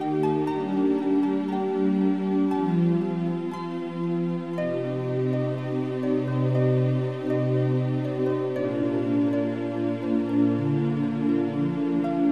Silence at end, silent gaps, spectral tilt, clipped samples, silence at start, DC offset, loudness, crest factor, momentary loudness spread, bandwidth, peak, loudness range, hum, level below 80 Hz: 0 s; none; -9.5 dB/octave; under 0.1%; 0 s; 0.2%; -25 LUFS; 12 dB; 5 LU; 6.6 kHz; -12 dBFS; 2 LU; none; -70 dBFS